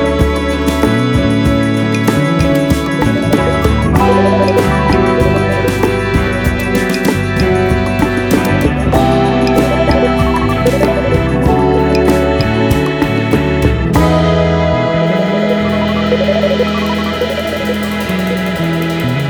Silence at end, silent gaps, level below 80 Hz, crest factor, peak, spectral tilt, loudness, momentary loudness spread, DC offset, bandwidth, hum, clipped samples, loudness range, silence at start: 0 s; none; -22 dBFS; 10 dB; 0 dBFS; -6.5 dB/octave; -12 LUFS; 4 LU; under 0.1%; over 20 kHz; none; under 0.1%; 2 LU; 0 s